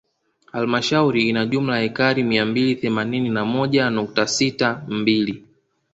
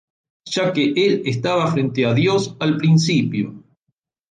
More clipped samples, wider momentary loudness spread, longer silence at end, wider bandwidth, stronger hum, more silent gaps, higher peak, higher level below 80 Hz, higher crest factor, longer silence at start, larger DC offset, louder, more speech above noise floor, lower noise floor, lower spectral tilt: neither; about the same, 5 LU vs 7 LU; second, 0.55 s vs 0.7 s; second, 8.2 kHz vs 9.4 kHz; neither; neither; first, -2 dBFS vs -6 dBFS; about the same, -58 dBFS vs -58 dBFS; about the same, 18 dB vs 14 dB; about the same, 0.55 s vs 0.45 s; neither; about the same, -20 LUFS vs -18 LUFS; second, 39 dB vs 57 dB; second, -59 dBFS vs -74 dBFS; about the same, -5 dB/octave vs -6 dB/octave